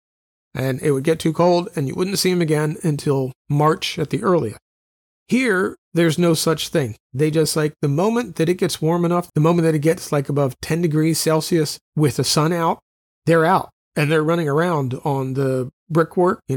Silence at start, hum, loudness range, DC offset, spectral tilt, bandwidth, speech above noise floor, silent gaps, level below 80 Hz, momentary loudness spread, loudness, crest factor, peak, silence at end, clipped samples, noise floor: 0.55 s; none; 2 LU; under 0.1%; -5.5 dB/octave; 18.5 kHz; over 71 dB; 3.35-3.45 s, 4.62-5.26 s, 5.78-5.92 s, 7.00-7.10 s, 11.81-11.93 s, 12.82-13.22 s, 13.73-13.91 s, 15.73-15.86 s; -56 dBFS; 6 LU; -19 LUFS; 14 dB; -4 dBFS; 0 s; under 0.1%; under -90 dBFS